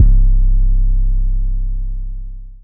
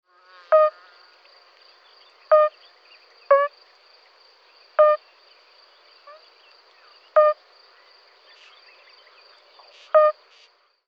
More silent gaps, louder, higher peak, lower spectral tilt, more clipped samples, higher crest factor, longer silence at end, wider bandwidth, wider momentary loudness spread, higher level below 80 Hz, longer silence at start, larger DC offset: neither; about the same, -19 LUFS vs -20 LUFS; first, 0 dBFS vs -6 dBFS; first, -14.5 dB/octave vs 0.5 dB/octave; neither; second, 12 dB vs 20 dB; second, 0.1 s vs 0.75 s; second, 0.5 kHz vs 5.4 kHz; first, 14 LU vs 10 LU; first, -12 dBFS vs under -90 dBFS; second, 0 s vs 0.5 s; neither